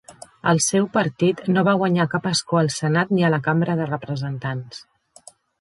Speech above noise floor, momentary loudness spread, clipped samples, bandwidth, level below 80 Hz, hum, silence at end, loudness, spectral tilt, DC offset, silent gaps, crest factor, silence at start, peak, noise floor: 29 dB; 10 LU; under 0.1%; 11.5 kHz; -62 dBFS; none; 0.8 s; -21 LUFS; -5 dB/octave; under 0.1%; none; 18 dB; 0.1 s; -4 dBFS; -49 dBFS